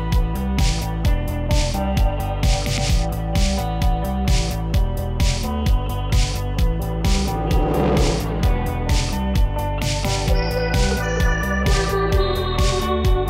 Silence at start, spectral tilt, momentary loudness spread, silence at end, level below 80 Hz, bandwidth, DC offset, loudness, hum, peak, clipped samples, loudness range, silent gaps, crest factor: 0 s; -5 dB/octave; 3 LU; 0 s; -22 dBFS; 16 kHz; under 0.1%; -21 LUFS; none; -8 dBFS; under 0.1%; 1 LU; none; 12 dB